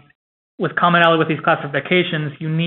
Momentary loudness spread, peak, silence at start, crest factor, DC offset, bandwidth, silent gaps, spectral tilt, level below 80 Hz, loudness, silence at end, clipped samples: 10 LU; 0 dBFS; 0.6 s; 18 dB; under 0.1%; 4.2 kHz; none; -3.5 dB/octave; -64 dBFS; -17 LUFS; 0 s; under 0.1%